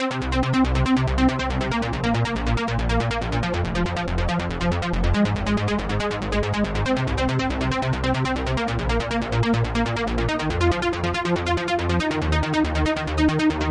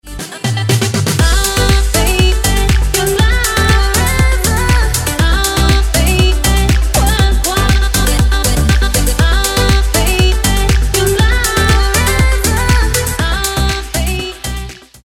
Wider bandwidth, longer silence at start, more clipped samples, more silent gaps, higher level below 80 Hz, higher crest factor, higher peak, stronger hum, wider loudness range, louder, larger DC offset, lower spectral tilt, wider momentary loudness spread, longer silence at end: second, 11 kHz vs 20 kHz; about the same, 0 s vs 0.05 s; neither; neither; second, -30 dBFS vs -14 dBFS; about the same, 14 dB vs 12 dB; second, -8 dBFS vs 0 dBFS; neither; about the same, 1 LU vs 1 LU; second, -23 LUFS vs -12 LUFS; neither; first, -6 dB/octave vs -4 dB/octave; about the same, 4 LU vs 4 LU; second, 0 s vs 0.3 s